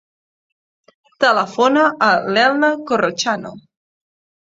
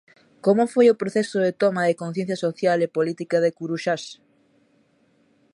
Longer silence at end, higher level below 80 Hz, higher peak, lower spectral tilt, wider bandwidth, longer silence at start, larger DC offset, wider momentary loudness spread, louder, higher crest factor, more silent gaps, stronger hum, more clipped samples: second, 0.95 s vs 1.4 s; first, -64 dBFS vs -74 dBFS; first, 0 dBFS vs -6 dBFS; second, -3.5 dB/octave vs -6 dB/octave; second, 7.8 kHz vs 11.5 kHz; first, 1.2 s vs 0.45 s; neither; about the same, 7 LU vs 9 LU; first, -16 LUFS vs -22 LUFS; about the same, 18 dB vs 18 dB; neither; neither; neither